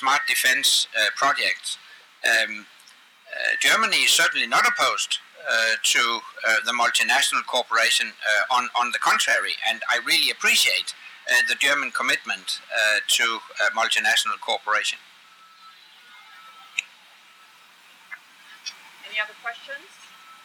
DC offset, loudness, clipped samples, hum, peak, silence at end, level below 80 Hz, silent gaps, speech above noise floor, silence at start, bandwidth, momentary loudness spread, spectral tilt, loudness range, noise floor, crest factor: under 0.1%; -20 LUFS; under 0.1%; none; -8 dBFS; 0.1 s; under -90 dBFS; none; 30 dB; 0 s; over 20 kHz; 16 LU; 1.5 dB/octave; 15 LU; -52 dBFS; 16 dB